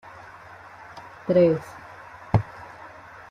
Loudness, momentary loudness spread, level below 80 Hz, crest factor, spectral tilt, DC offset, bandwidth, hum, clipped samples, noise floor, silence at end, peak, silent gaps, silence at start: -23 LUFS; 24 LU; -50 dBFS; 20 dB; -9 dB/octave; under 0.1%; 11 kHz; none; under 0.1%; -45 dBFS; 0.45 s; -6 dBFS; none; 0.95 s